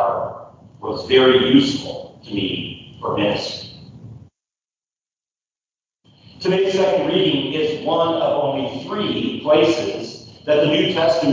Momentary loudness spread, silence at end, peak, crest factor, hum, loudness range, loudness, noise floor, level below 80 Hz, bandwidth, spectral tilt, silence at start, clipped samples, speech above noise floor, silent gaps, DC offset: 16 LU; 0 s; -2 dBFS; 18 dB; none; 9 LU; -18 LUFS; under -90 dBFS; -52 dBFS; 7.6 kHz; -5.5 dB/octave; 0 s; under 0.1%; over 73 dB; none; under 0.1%